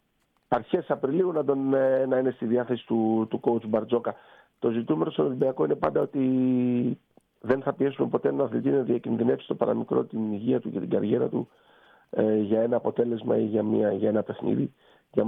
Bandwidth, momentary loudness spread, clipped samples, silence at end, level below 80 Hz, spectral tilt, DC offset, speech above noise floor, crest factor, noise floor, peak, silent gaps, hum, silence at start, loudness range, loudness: 4.1 kHz; 6 LU; under 0.1%; 0 s; -66 dBFS; -10.5 dB/octave; under 0.1%; 46 dB; 16 dB; -71 dBFS; -10 dBFS; none; none; 0.5 s; 2 LU; -26 LUFS